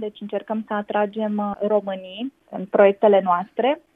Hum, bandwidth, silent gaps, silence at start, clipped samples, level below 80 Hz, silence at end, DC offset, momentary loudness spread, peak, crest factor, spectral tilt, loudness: none; 3.9 kHz; none; 0 s; under 0.1%; -68 dBFS; 0.15 s; under 0.1%; 15 LU; -4 dBFS; 18 dB; -8.5 dB/octave; -21 LUFS